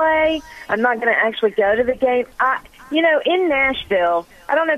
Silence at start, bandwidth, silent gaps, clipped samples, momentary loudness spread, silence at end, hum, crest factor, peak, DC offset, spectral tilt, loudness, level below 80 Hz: 0 s; 14 kHz; none; under 0.1%; 7 LU; 0 s; none; 14 dB; -4 dBFS; under 0.1%; -5 dB/octave; -18 LUFS; -48 dBFS